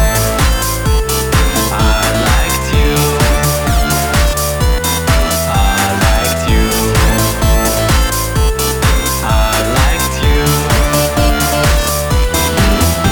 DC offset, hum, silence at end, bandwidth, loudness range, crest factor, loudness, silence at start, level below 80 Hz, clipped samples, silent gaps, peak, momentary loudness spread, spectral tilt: under 0.1%; none; 0 s; over 20 kHz; 0 LU; 10 dB; -12 LUFS; 0 s; -16 dBFS; under 0.1%; none; 0 dBFS; 2 LU; -4 dB/octave